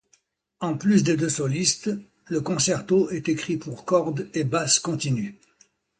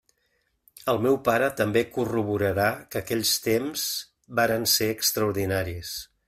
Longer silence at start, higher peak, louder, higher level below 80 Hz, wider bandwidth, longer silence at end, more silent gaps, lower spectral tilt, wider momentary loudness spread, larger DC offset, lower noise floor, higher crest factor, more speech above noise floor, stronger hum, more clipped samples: second, 0.6 s vs 0.85 s; about the same, -6 dBFS vs -8 dBFS; about the same, -24 LUFS vs -25 LUFS; about the same, -62 dBFS vs -58 dBFS; second, 9.4 kHz vs 16 kHz; first, 0.65 s vs 0.25 s; neither; about the same, -4.5 dB/octave vs -3.5 dB/octave; about the same, 10 LU vs 10 LU; neither; second, -66 dBFS vs -72 dBFS; about the same, 18 dB vs 18 dB; second, 42 dB vs 47 dB; neither; neither